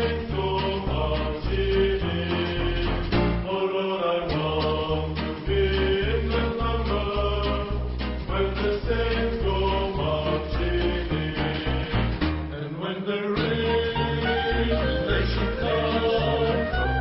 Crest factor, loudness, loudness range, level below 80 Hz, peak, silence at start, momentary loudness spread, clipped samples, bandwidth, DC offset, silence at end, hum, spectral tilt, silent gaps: 14 dB; -25 LUFS; 2 LU; -30 dBFS; -10 dBFS; 0 s; 4 LU; under 0.1%; 5.8 kHz; under 0.1%; 0 s; none; -10.5 dB/octave; none